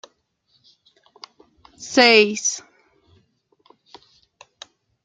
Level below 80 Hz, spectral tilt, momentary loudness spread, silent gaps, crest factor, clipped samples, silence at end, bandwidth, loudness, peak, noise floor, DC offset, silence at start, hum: -70 dBFS; -1.5 dB/octave; 21 LU; none; 24 dB; under 0.1%; 2.45 s; 9.4 kHz; -16 LUFS; 0 dBFS; -66 dBFS; under 0.1%; 1.8 s; none